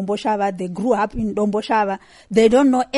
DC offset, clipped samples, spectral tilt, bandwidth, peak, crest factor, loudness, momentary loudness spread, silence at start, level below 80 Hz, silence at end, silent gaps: under 0.1%; under 0.1%; -6 dB/octave; 11.5 kHz; -4 dBFS; 14 dB; -19 LUFS; 10 LU; 0 s; -44 dBFS; 0 s; none